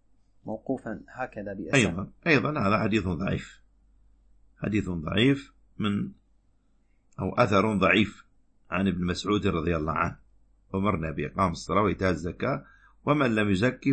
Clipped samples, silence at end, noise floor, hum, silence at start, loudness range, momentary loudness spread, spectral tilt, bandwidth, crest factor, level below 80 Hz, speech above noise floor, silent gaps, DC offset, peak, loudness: under 0.1%; 0 s; -64 dBFS; none; 0.45 s; 4 LU; 13 LU; -6 dB/octave; 8.8 kHz; 22 dB; -50 dBFS; 38 dB; none; under 0.1%; -6 dBFS; -27 LUFS